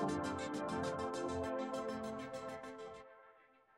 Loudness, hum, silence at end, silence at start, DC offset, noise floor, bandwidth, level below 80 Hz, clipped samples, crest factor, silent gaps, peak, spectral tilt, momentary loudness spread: -42 LUFS; none; 0.35 s; 0 s; under 0.1%; -67 dBFS; 16 kHz; -68 dBFS; under 0.1%; 16 dB; none; -26 dBFS; -5.5 dB/octave; 12 LU